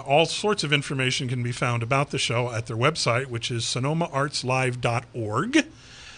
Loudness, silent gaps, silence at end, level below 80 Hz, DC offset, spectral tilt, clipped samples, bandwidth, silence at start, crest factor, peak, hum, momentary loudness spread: -24 LUFS; none; 0 s; -54 dBFS; under 0.1%; -4.5 dB/octave; under 0.1%; 10.5 kHz; 0 s; 18 dB; -6 dBFS; none; 6 LU